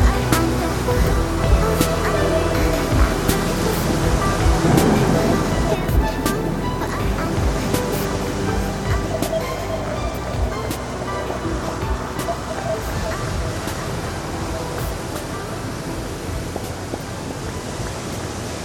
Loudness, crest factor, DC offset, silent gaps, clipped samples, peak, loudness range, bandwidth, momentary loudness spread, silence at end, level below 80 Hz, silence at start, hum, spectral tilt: -21 LUFS; 20 dB; under 0.1%; none; under 0.1%; -2 dBFS; 9 LU; 18 kHz; 10 LU; 0 s; -26 dBFS; 0 s; none; -5.5 dB/octave